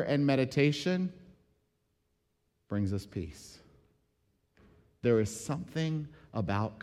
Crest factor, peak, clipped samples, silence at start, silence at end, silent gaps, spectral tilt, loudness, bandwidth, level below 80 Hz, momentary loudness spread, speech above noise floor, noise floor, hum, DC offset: 18 dB; -14 dBFS; under 0.1%; 0 s; 0 s; none; -6.5 dB/octave; -32 LUFS; 14 kHz; -60 dBFS; 13 LU; 46 dB; -77 dBFS; none; under 0.1%